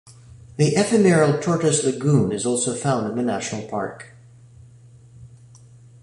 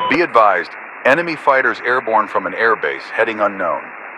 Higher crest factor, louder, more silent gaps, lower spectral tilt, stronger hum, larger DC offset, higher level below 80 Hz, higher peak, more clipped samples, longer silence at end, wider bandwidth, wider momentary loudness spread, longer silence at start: about the same, 18 dB vs 16 dB; second, -20 LUFS vs -16 LUFS; neither; about the same, -5.5 dB/octave vs -5 dB/octave; neither; neither; about the same, -56 dBFS vs -60 dBFS; second, -4 dBFS vs 0 dBFS; neither; first, 0.75 s vs 0 s; about the same, 11.5 kHz vs 11 kHz; first, 12 LU vs 8 LU; about the same, 0.05 s vs 0 s